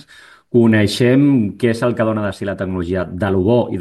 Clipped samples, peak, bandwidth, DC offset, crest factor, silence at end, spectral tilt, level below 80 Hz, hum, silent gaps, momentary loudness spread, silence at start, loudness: under 0.1%; -2 dBFS; 12.5 kHz; under 0.1%; 14 dB; 0 s; -7 dB/octave; -48 dBFS; none; none; 9 LU; 0.55 s; -16 LUFS